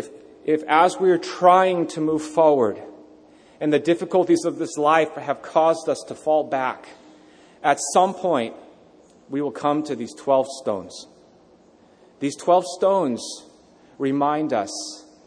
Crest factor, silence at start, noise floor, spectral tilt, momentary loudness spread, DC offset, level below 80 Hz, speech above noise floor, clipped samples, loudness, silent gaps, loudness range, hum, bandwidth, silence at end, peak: 20 dB; 0 s; -53 dBFS; -4.5 dB/octave; 13 LU; under 0.1%; -70 dBFS; 33 dB; under 0.1%; -21 LUFS; none; 6 LU; none; 10.5 kHz; 0.25 s; -2 dBFS